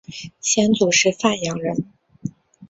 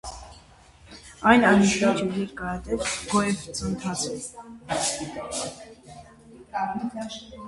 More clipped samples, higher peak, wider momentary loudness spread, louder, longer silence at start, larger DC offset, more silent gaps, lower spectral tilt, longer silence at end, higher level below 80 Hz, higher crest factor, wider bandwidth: neither; about the same, -2 dBFS vs -2 dBFS; second, 19 LU vs 25 LU; first, -19 LUFS vs -25 LUFS; about the same, 0.1 s vs 0.05 s; neither; neither; about the same, -3 dB/octave vs -4 dB/octave; about the same, 0.05 s vs 0 s; second, -58 dBFS vs -50 dBFS; second, 18 dB vs 24 dB; second, 8 kHz vs 11.5 kHz